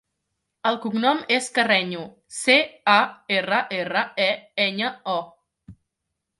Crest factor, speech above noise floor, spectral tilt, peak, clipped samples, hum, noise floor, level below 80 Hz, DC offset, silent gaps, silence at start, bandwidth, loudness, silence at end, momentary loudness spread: 20 dB; 58 dB; -3 dB/octave; -4 dBFS; under 0.1%; none; -81 dBFS; -68 dBFS; under 0.1%; none; 0.65 s; 11.5 kHz; -22 LUFS; 0.7 s; 10 LU